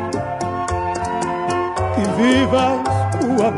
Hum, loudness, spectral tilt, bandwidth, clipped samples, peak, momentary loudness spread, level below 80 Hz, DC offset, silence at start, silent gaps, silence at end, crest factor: none; -19 LUFS; -6 dB/octave; 11 kHz; under 0.1%; -4 dBFS; 8 LU; -42 dBFS; under 0.1%; 0 s; none; 0 s; 14 dB